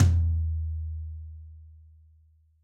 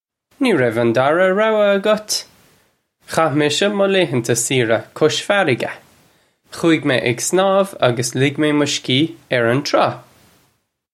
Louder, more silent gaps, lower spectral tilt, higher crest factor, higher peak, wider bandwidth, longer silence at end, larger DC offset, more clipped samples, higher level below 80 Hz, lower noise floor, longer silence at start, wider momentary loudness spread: second, -30 LUFS vs -17 LUFS; neither; first, -7.5 dB/octave vs -4 dB/octave; about the same, 18 dB vs 16 dB; second, -10 dBFS vs 0 dBFS; second, 7.4 kHz vs 15.5 kHz; about the same, 0.9 s vs 0.95 s; neither; neither; first, -34 dBFS vs -62 dBFS; about the same, -61 dBFS vs -64 dBFS; second, 0 s vs 0.4 s; first, 23 LU vs 6 LU